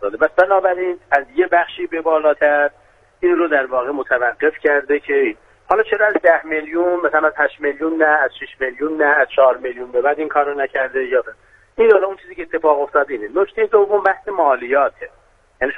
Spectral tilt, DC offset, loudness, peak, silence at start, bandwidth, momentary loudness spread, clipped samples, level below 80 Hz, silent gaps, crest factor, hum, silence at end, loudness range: -6 dB/octave; under 0.1%; -17 LUFS; 0 dBFS; 0 s; 4.5 kHz; 8 LU; under 0.1%; -54 dBFS; none; 16 dB; none; 0 s; 1 LU